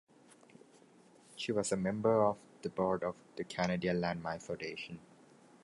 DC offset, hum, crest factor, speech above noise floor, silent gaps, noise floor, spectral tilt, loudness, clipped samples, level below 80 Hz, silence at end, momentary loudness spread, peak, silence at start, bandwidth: under 0.1%; none; 20 dB; 28 dB; none; -63 dBFS; -5.5 dB/octave; -36 LUFS; under 0.1%; -68 dBFS; 0.65 s; 14 LU; -18 dBFS; 1.3 s; 11.5 kHz